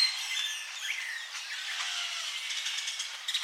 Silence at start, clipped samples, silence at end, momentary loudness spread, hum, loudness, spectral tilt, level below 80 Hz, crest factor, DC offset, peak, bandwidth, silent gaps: 0 s; under 0.1%; 0 s; 5 LU; none; -32 LUFS; 9.5 dB/octave; under -90 dBFS; 20 dB; under 0.1%; -16 dBFS; 16 kHz; none